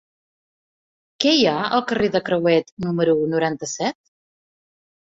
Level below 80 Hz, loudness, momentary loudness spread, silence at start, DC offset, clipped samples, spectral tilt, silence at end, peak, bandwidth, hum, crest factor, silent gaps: -60 dBFS; -20 LUFS; 8 LU; 1.2 s; under 0.1%; under 0.1%; -4.5 dB/octave; 1.1 s; 0 dBFS; 8 kHz; none; 22 dB; 2.72-2.77 s